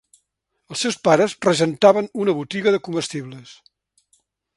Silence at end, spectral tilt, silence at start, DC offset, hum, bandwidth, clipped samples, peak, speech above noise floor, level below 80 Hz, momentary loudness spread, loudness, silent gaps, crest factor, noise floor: 1.05 s; -4.5 dB/octave; 0.7 s; under 0.1%; none; 11.5 kHz; under 0.1%; 0 dBFS; 54 dB; -64 dBFS; 16 LU; -19 LUFS; none; 20 dB; -74 dBFS